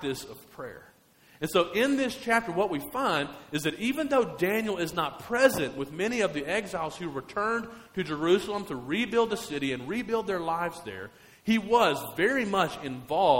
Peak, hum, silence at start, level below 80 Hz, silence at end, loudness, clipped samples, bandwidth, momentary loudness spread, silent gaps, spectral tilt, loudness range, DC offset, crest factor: -8 dBFS; none; 0 s; -60 dBFS; 0 s; -28 LUFS; under 0.1%; 16.5 kHz; 13 LU; none; -4.5 dB/octave; 2 LU; under 0.1%; 20 dB